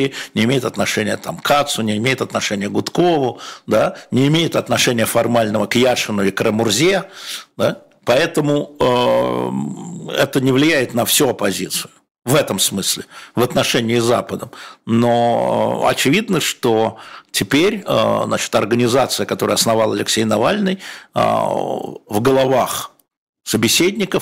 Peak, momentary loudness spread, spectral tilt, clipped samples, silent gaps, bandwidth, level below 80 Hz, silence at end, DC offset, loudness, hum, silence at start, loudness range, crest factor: -4 dBFS; 9 LU; -4 dB/octave; under 0.1%; 12.11-12.15 s, 23.17-23.33 s; 16.5 kHz; -52 dBFS; 0 s; under 0.1%; -17 LUFS; none; 0 s; 2 LU; 12 dB